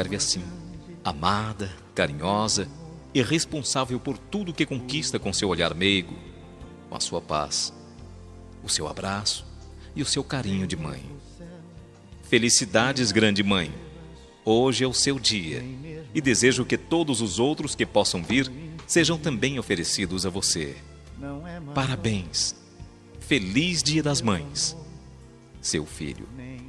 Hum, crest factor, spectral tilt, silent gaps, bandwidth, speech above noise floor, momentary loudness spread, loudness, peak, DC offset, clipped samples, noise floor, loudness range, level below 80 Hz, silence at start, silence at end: none; 24 dB; -3.5 dB/octave; none; 13 kHz; 22 dB; 21 LU; -25 LUFS; -4 dBFS; under 0.1%; under 0.1%; -47 dBFS; 6 LU; -48 dBFS; 0 s; 0 s